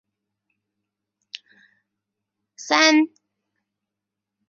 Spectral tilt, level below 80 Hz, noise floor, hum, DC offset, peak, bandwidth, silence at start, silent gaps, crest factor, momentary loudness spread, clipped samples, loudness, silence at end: -0.5 dB/octave; -80 dBFS; -85 dBFS; none; under 0.1%; -2 dBFS; 7.4 kHz; 2.6 s; none; 26 dB; 24 LU; under 0.1%; -18 LUFS; 1.45 s